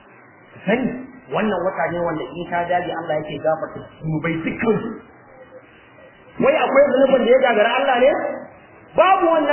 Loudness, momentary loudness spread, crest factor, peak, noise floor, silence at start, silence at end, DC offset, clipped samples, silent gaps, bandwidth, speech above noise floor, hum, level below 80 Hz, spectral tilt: -19 LUFS; 13 LU; 18 dB; -2 dBFS; -47 dBFS; 0.55 s; 0 s; under 0.1%; under 0.1%; none; 3.2 kHz; 29 dB; none; -54 dBFS; -9.5 dB/octave